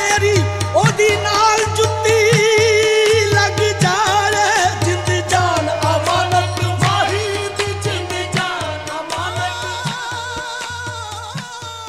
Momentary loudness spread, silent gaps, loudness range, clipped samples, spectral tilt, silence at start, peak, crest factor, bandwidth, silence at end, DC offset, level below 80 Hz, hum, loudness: 12 LU; none; 8 LU; under 0.1%; -3.5 dB/octave; 0 s; -2 dBFS; 16 dB; 15.5 kHz; 0 s; 0.2%; -46 dBFS; none; -16 LUFS